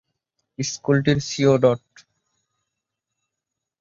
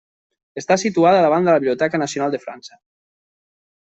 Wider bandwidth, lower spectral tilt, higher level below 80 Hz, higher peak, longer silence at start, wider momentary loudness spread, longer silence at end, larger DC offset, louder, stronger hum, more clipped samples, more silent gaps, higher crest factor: about the same, 7.6 kHz vs 8.2 kHz; about the same, -5.5 dB/octave vs -5 dB/octave; first, -56 dBFS vs -64 dBFS; about the same, -4 dBFS vs -4 dBFS; about the same, 0.6 s vs 0.55 s; second, 12 LU vs 20 LU; first, 2.05 s vs 1.25 s; neither; second, -20 LUFS vs -17 LUFS; neither; neither; neither; about the same, 20 dB vs 16 dB